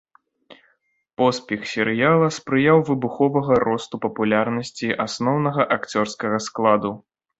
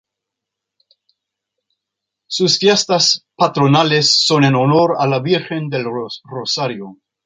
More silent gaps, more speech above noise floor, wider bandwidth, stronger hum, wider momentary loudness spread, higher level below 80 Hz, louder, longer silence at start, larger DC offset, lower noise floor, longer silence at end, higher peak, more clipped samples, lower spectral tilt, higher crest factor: neither; second, 45 dB vs 66 dB; second, 8.2 kHz vs 9.4 kHz; neither; second, 9 LU vs 13 LU; about the same, -60 dBFS vs -60 dBFS; second, -21 LUFS vs -14 LUFS; second, 0.5 s vs 2.3 s; neither; second, -65 dBFS vs -82 dBFS; about the same, 0.4 s vs 0.3 s; about the same, -2 dBFS vs -2 dBFS; neither; first, -6 dB/octave vs -4 dB/octave; about the same, 18 dB vs 16 dB